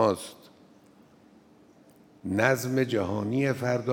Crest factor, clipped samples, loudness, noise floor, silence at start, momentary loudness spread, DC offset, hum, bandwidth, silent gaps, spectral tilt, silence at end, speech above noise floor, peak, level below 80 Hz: 22 dB; under 0.1%; -27 LUFS; -57 dBFS; 0 s; 11 LU; under 0.1%; none; 18.5 kHz; none; -6 dB/octave; 0 s; 30 dB; -6 dBFS; -72 dBFS